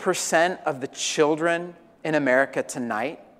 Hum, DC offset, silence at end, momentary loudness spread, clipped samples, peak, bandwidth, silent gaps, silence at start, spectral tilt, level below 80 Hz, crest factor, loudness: none; under 0.1%; 0.15 s; 8 LU; under 0.1%; -6 dBFS; 15.5 kHz; none; 0 s; -3.5 dB/octave; -72 dBFS; 18 dB; -24 LUFS